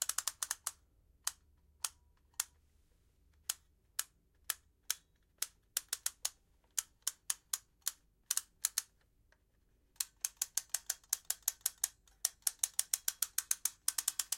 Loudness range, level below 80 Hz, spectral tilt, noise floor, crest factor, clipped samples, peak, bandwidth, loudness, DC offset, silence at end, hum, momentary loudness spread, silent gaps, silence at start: 8 LU; -74 dBFS; 3.5 dB/octave; -73 dBFS; 34 dB; under 0.1%; -10 dBFS; 17 kHz; -39 LUFS; under 0.1%; 0 s; none; 8 LU; none; 0 s